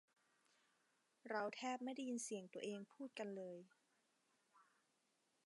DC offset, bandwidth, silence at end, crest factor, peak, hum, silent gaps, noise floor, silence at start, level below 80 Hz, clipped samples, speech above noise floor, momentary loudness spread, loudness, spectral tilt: under 0.1%; 11.5 kHz; 0.85 s; 22 dB; -30 dBFS; none; none; -84 dBFS; 1.25 s; under -90 dBFS; under 0.1%; 36 dB; 9 LU; -49 LUFS; -3.5 dB/octave